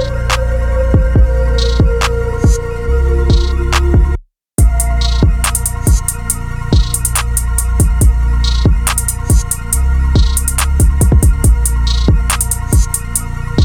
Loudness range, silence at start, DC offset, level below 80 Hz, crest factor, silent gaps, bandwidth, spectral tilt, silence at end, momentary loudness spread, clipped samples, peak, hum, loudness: 2 LU; 0 s; under 0.1%; -12 dBFS; 12 dB; none; 19 kHz; -4.5 dB/octave; 0 s; 4 LU; under 0.1%; 0 dBFS; none; -14 LUFS